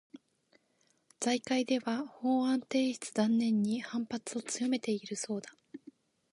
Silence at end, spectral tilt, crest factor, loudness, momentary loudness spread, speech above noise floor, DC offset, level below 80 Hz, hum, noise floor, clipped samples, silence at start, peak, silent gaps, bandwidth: 0.55 s; -4 dB/octave; 18 dB; -33 LUFS; 10 LU; 41 dB; under 0.1%; -82 dBFS; none; -73 dBFS; under 0.1%; 0.15 s; -16 dBFS; none; 11.5 kHz